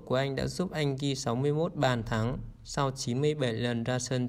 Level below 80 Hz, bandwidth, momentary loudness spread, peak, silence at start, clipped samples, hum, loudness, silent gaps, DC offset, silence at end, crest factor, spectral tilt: -50 dBFS; 15 kHz; 4 LU; -14 dBFS; 0 s; under 0.1%; none; -31 LUFS; none; under 0.1%; 0 s; 16 dB; -5.5 dB/octave